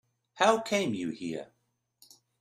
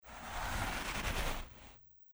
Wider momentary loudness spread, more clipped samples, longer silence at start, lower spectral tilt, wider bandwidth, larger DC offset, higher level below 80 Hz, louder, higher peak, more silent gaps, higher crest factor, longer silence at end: second, 13 LU vs 18 LU; neither; first, 0.35 s vs 0.05 s; about the same, -4 dB/octave vs -3 dB/octave; second, 15 kHz vs over 20 kHz; neither; second, -74 dBFS vs -44 dBFS; first, -29 LUFS vs -39 LUFS; first, -10 dBFS vs -24 dBFS; neither; first, 22 dB vs 16 dB; first, 0.95 s vs 0 s